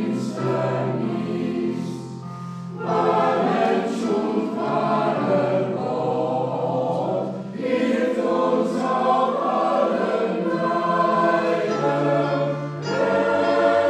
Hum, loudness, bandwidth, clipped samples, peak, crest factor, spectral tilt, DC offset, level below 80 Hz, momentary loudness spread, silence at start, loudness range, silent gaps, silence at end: none; -22 LUFS; 11 kHz; under 0.1%; -6 dBFS; 14 dB; -7 dB/octave; under 0.1%; -66 dBFS; 7 LU; 0 s; 3 LU; none; 0 s